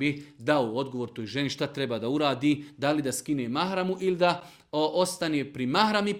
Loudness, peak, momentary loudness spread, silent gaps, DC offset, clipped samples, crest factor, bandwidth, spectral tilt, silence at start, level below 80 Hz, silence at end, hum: -28 LUFS; -8 dBFS; 7 LU; none; under 0.1%; under 0.1%; 20 dB; 16.5 kHz; -5 dB/octave; 0 s; -68 dBFS; 0 s; none